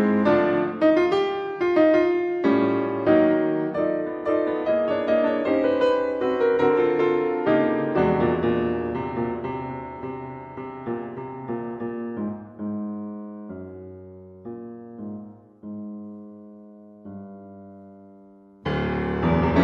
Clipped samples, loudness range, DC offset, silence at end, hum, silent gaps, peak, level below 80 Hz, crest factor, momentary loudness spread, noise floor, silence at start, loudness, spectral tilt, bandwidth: under 0.1%; 18 LU; under 0.1%; 0 s; none; none; -6 dBFS; -48 dBFS; 18 dB; 20 LU; -50 dBFS; 0 s; -23 LUFS; -8.5 dB/octave; 7 kHz